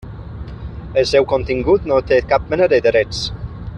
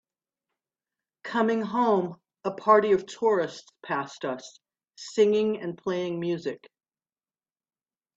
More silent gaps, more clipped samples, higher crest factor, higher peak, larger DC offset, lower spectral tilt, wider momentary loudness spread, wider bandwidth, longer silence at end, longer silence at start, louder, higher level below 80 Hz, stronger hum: neither; neither; second, 14 dB vs 22 dB; first, -2 dBFS vs -6 dBFS; neither; about the same, -5.5 dB/octave vs -5.5 dB/octave; about the same, 17 LU vs 15 LU; first, 10 kHz vs 7.8 kHz; second, 0 s vs 1.6 s; second, 0 s vs 1.25 s; first, -16 LUFS vs -26 LUFS; first, -34 dBFS vs -72 dBFS; neither